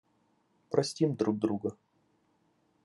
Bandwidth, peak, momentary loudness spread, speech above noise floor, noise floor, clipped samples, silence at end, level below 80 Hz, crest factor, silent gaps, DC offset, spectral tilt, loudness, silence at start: 11.5 kHz; -12 dBFS; 6 LU; 42 dB; -72 dBFS; under 0.1%; 1.1 s; -82 dBFS; 22 dB; none; under 0.1%; -6.5 dB/octave; -31 LUFS; 0.7 s